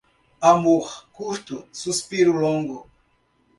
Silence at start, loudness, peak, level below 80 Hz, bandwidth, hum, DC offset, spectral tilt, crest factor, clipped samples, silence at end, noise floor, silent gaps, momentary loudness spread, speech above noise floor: 0.4 s; -21 LUFS; -2 dBFS; -62 dBFS; 11.5 kHz; none; under 0.1%; -5 dB/octave; 22 dB; under 0.1%; 0.75 s; -64 dBFS; none; 17 LU; 43 dB